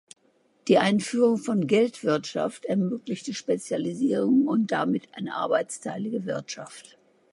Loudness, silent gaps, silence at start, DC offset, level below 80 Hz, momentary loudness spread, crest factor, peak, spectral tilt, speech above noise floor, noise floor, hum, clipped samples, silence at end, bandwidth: -26 LUFS; none; 0.65 s; under 0.1%; -76 dBFS; 11 LU; 18 dB; -6 dBFS; -5.5 dB/octave; 40 dB; -65 dBFS; none; under 0.1%; 0.5 s; 11.5 kHz